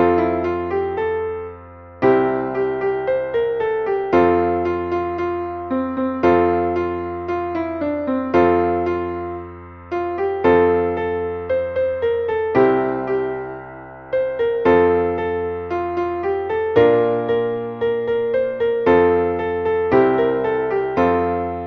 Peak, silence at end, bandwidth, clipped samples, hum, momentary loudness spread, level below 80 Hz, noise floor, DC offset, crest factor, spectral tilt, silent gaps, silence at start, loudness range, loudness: -2 dBFS; 0 s; 6.2 kHz; under 0.1%; none; 9 LU; -46 dBFS; -39 dBFS; under 0.1%; 16 dB; -8.5 dB/octave; none; 0 s; 3 LU; -19 LUFS